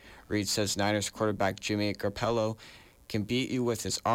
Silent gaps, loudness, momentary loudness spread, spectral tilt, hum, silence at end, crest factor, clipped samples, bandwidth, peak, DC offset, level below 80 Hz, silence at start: none; -30 LUFS; 7 LU; -4 dB/octave; none; 0 s; 14 dB; under 0.1%; 17 kHz; -18 dBFS; under 0.1%; -58 dBFS; 0.05 s